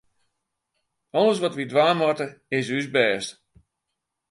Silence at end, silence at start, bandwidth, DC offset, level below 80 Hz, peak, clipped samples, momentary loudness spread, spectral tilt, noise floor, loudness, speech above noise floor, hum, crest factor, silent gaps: 1 s; 1.15 s; 11.5 kHz; under 0.1%; -70 dBFS; -4 dBFS; under 0.1%; 9 LU; -4.5 dB/octave; -82 dBFS; -23 LUFS; 59 dB; none; 22 dB; none